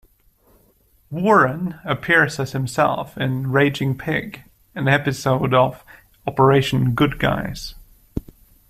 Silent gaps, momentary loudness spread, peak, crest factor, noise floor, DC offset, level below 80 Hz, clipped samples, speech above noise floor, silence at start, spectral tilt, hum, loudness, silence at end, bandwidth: none; 17 LU; -2 dBFS; 18 dB; -58 dBFS; under 0.1%; -44 dBFS; under 0.1%; 39 dB; 1.1 s; -6 dB/octave; none; -19 LUFS; 0.5 s; 15 kHz